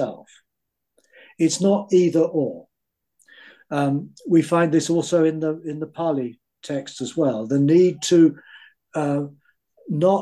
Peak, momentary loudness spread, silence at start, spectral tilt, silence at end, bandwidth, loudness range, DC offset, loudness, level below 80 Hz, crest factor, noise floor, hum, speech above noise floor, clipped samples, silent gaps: -6 dBFS; 13 LU; 0 s; -6 dB/octave; 0 s; 12 kHz; 2 LU; under 0.1%; -21 LUFS; -70 dBFS; 16 dB; -81 dBFS; none; 61 dB; under 0.1%; none